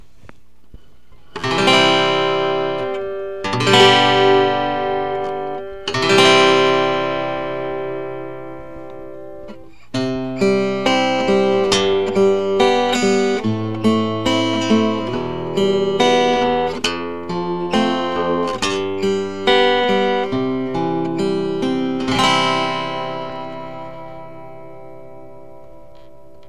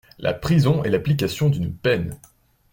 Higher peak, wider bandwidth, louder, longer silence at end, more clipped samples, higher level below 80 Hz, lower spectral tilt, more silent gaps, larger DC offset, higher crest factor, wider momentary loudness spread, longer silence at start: first, 0 dBFS vs -6 dBFS; second, 12.5 kHz vs 17 kHz; first, -17 LUFS vs -21 LUFS; first, 0.7 s vs 0.55 s; neither; about the same, -50 dBFS vs -46 dBFS; second, -4.5 dB/octave vs -7 dB/octave; neither; first, 2% vs under 0.1%; about the same, 18 dB vs 16 dB; first, 19 LU vs 7 LU; first, 1.35 s vs 0.2 s